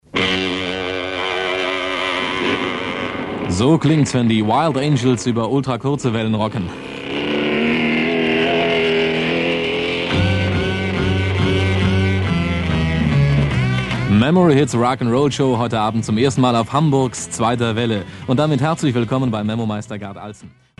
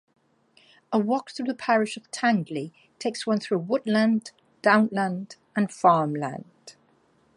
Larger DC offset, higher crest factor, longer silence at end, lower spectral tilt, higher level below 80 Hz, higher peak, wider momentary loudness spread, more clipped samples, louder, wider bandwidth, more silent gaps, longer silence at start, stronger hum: neither; second, 14 dB vs 22 dB; second, 0.3 s vs 0.65 s; about the same, -6 dB/octave vs -5.5 dB/octave; first, -38 dBFS vs -76 dBFS; about the same, -4 dBFS vs -4 dBFS; second, 7 LU vs 13 LU; neither; first, -18 LUFS vs -25 LUFS; about the same, 11.5 kHz vs 11.5 kHz; neither; second, 0.15 s vs 0.9 s; neither